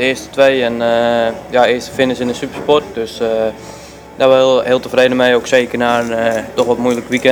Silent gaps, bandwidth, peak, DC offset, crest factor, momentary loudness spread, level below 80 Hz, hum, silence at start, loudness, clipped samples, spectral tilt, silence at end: none; 20 kHz; 0 dBFS; under 0.1%; 14 dB; 9 LU; -46 dBFS; none; 0 s; -14 LUFS; under 0.1%; -4.5 dB/octave; 0 s